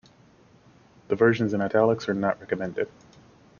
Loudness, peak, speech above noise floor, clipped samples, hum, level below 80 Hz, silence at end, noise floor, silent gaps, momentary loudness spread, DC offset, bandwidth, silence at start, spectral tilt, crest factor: -25 LUFS; -8 dBFS; 32 dB; under 0.1%; none; -62 dBFS; 0.7 s; -56 dBFS; none; 10 LU; under 0.1%; 7 kHz; 1.1 s; -7.5 dB/octave; 20 dB